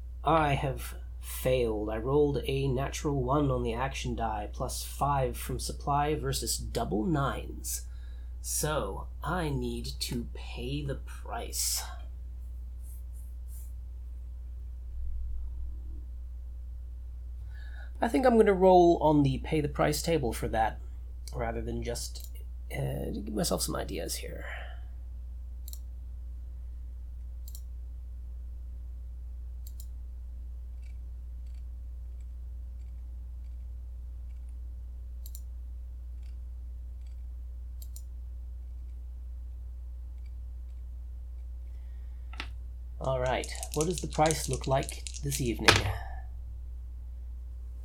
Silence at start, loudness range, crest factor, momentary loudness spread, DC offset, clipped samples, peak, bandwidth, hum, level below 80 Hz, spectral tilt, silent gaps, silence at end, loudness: 0 s; 17 LU; 32 dB; 16 LU; under 0.1%; under 0.1%; 0 dBFS; 19 kHz; none; -40 dBFS; -5 dB/octave; none; 0 s; -31 LUFS